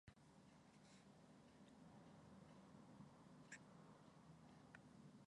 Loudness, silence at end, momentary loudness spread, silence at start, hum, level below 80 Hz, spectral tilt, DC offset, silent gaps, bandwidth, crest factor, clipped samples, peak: -66 LUFS; 0.05 s; 7 LU; 0.05 s; none; -84 dBFS; -5 dB/octave; under 0.1%; none; 10.5 kHz; 22 dB; under 0.1%; -44 dBFS